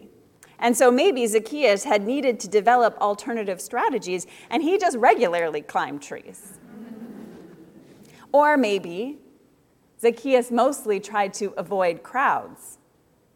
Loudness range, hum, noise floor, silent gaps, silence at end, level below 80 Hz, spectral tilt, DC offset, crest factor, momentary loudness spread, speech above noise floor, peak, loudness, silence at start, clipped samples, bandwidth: 5 LU; none; -61 dBFS; none; 0.6 s; -72 dBFS; -3.5 dB/octave; under 0.1%; 20 dB; 21 LU; 40 dB; -4 dBFS; -22 LUFS; 0.6 s; under 0.1%; 17 kHz